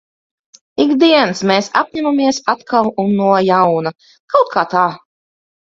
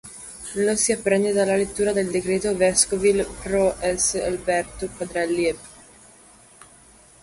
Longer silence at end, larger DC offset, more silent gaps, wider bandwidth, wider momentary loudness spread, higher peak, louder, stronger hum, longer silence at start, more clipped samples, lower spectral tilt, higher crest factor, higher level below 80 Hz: second, 0.65 s vs 1.5 s; neither; first, 4.20-4.28 s vs none; second, 7.8 kHz vs 11.5 kHz; second, 7 LU vs 11 LU; first, 0 dBFS vs -4 dBFS; first, -14 LUFS vs -22 LUFS; neither; first, 0.8 s vs 0.05 s; neither; first, -5 dB/octave vs -3.5 dB/octave; second, 14 dB vs 20 dB; second, -58 dBFS vs -48 dBFS